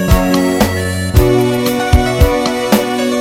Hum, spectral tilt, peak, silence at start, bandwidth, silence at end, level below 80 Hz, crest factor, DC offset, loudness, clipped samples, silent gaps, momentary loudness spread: none; -5.5 dB/octave; 0 dBFS; 0 s; 17 kHz; 0 s; -18 dBFS; 12 dB; under 0.1%; -13 LUFS; 0.3%; none; 3 LU